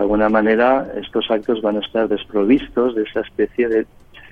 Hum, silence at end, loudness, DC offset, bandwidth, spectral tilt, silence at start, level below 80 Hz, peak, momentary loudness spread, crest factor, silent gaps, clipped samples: none; 0.1 s; -18 LUFS; under 0.1%; 5 kHz; -7.5 dB/octave; 0 s; -44 dBFS; -2 dBFS; 8 LU; 16 dB; none; under 0.1%